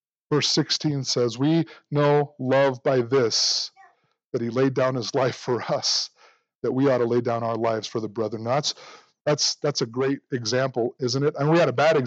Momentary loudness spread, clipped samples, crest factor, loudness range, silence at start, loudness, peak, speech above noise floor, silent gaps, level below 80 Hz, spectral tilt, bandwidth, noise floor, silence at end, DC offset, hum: 8 LU; under 0.1%; 14 dB; 3 LU; 0.3 s; -23 LUFS; -8 dBFS; 37 dB; 4.25-4.32 s, 6.55-6.62 s, 9.21-9.25 s; -76 dBFS; -4.5 dB/octave; 8.2 kHz; -60 dBFS; 0 s; under 0.1%; none